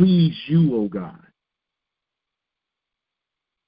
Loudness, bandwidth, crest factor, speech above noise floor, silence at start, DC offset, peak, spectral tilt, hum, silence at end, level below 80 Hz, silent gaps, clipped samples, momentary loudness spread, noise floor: -20 LUFS; 5 kHz; 18 dB; 67 dB; 0 s; under 0.1%; -4 dBFS; -12.5 dB/octave; none; 2.55 s; -56 dBFS; none; under 0.1%; 15 LU; -85 dBFS